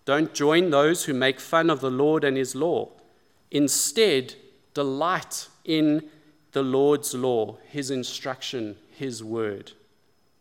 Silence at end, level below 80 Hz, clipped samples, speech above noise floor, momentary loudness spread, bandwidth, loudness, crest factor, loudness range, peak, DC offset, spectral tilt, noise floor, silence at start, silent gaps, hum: 0.7 s; -76 dBFS; under 0.1%; 43 dB; 13 LU; 17 kHz; -24 LUFS; 18 dB; 4 LU; -6 dBFS; under 0.1%; -4 dB/octave; -67 dBFS; 0.05 s; none; none